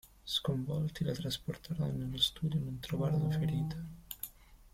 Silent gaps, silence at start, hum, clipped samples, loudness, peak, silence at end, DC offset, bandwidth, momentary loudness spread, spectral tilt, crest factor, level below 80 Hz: none; 0.05 s; none; under 0.1%; -36 LUFS; -16 dBFS; 0.05 s; under 0.1%; 16.5 kHz; 12 LU; -6 dB/octave; 20 dB; -56 dBFS